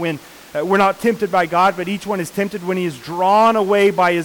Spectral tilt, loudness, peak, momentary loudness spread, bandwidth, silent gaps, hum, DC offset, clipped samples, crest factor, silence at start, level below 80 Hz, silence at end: -5.5 dB/octave; -17 LUFS; -6 dBFS; 11 LU; 19 kHz; none; none; under 0.1%; under 0.1%; 12 dB; 0 s; -56 dBFS; 0 s